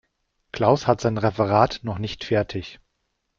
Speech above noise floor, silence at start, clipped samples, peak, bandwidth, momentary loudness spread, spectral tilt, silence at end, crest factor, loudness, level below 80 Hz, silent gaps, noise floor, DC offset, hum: 53 dB; 0.55 s; under 0.1%; -2 dBFS; 7.4 kHz; 13 LU; -6.5 dB/octave; 0.65 s; 20 dB; -22 LUFS; -50 dBFS; none; -75 dBFS; under 0.1%; none